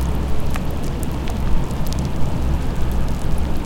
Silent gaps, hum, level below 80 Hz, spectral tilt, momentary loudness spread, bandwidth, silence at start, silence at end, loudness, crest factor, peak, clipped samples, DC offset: none; none; -22 dBFS; -6.5 dB/octave; 2 LU; 16.5 kHz; 0 s; 0 s; -24 LUFS; 14 dB; -4 dBFS; under 0.1%; under 0.1%